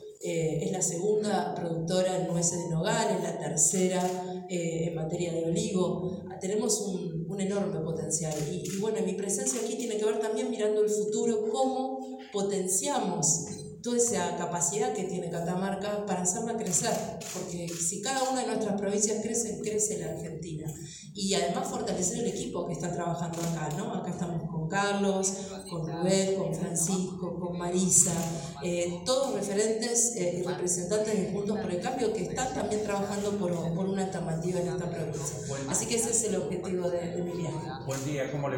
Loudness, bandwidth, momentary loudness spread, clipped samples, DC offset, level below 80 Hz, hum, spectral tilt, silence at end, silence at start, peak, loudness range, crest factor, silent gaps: -30 LUFS; 17 kHz; 8 LU; under 0.1%; under 0.1%; -60 dBFS; none; -4 dB/octave; 0 s; 0 s; -6 dBFS; 4 LU; 24 dB; none